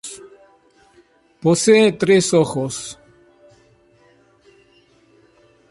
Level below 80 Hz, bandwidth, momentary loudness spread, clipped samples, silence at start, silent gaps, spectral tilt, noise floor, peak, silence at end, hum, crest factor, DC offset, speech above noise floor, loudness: -58 dBFS; 11.5 kHz; 21 LU; under 0.1%; 0.05 s; none; -4.5 dB/octave; -55 dBFS; -2 dBFS; 2.75 s; none; 18 dB; under 0.1%; 40 dB; -16 LUFS